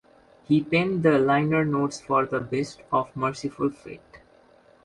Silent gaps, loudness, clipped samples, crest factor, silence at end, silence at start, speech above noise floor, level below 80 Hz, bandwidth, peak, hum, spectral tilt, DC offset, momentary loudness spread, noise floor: none; -24 LUFS; under 0.1%; 18 dB; 0.65 s; 0.5 s; 32 dB; -60 dBFS; 11.5 kHz; -6 dBFS; none; -6.5 dB/octave; under 0.1%; 9 LU; -56 dBFS